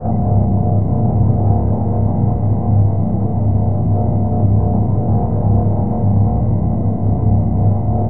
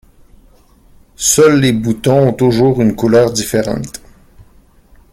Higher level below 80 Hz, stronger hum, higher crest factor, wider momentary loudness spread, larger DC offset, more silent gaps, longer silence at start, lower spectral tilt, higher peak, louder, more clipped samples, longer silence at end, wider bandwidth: first, -26 dBFS vs -42 dBFS; neither; about the same, 12 dB vs 14 dB; second, 2 LU vs 11 LU; first, 5% vs under 0.1%; neither; second, 0 s vs 1.2 s; first, -16.5 dB/octave vs -5 dB/octave; about the same, -2 dBFS vs 0 dBFS; second, -16 LUFS vs -12 LUFS; neither; second, 0 s vs 0.7 s; second, 2.1 kHz vs 17 kHz